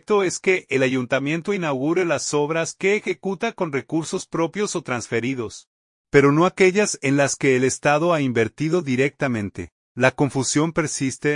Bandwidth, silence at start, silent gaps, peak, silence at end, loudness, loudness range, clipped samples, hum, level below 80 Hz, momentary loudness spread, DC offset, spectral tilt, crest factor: 11 kHz; 0.1 s; 5.67-6.05 s, 9.72-9.95 s; -2 dBFS; 0 s; -21 LUFS; 5 LU; under 0.1%; none; -56 dBFS; 9 LU; under 0.1%; -5 dB/octave; 20 dB